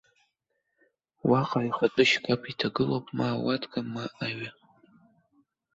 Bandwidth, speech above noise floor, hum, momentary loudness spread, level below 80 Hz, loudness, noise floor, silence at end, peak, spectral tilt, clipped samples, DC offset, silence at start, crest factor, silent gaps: 7.8 kHz; 52 dB; none; 11 LU; -64 dBFS; -28 LUFS; -79 dBFS; 1.25 s; -8 dBFS; -5.5 dB/octave; under 0.1%; under 0.1%; 1.25 s; 22 dB; none